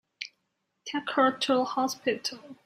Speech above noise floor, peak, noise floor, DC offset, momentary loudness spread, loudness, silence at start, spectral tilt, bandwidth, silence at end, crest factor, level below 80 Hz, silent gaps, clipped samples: 51 dB; -10 dBFS; -79 dBFS; under 0.1%; 16 LU; -28 LUFS; 0.2 s; -3 dB/octave; 15.5 kHz; 0.1 s; 20 dB; -78 dBFS; none; under 0.1%